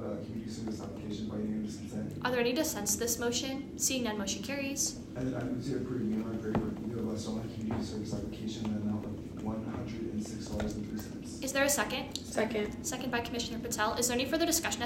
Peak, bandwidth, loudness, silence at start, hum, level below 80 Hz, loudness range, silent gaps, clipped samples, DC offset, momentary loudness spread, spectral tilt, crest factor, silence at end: -16 dBFS; 16 kHz; -34 LUFS; 0 s; none; -54 dBFS; 5 LU; none; under 0.1%; under 0.1%; 9 LU; -3.5 dB/octave; 20 dB; 0 s